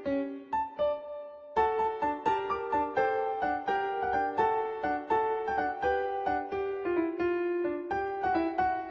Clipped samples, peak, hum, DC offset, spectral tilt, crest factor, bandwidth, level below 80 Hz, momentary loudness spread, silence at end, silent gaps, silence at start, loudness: under 0.1%; -14 dBFS; none; under 0.1%; -6.5 dB/octave; 16 dB; 7.6 kHz; -58 dBFS; 5 LU; 0 s; none; 0 s; -31 LUFS